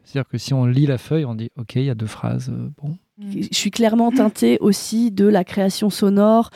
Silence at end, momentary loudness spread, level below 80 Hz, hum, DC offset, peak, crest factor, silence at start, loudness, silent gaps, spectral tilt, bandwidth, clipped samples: 0.1 s; 13 LU; -58 dBFS; none; under 0.1%; -4 dBFS; 14 dB; 0.15 s; -19 LUFS; none; -6 dB/octave; 15.5 kHz; under 0.1%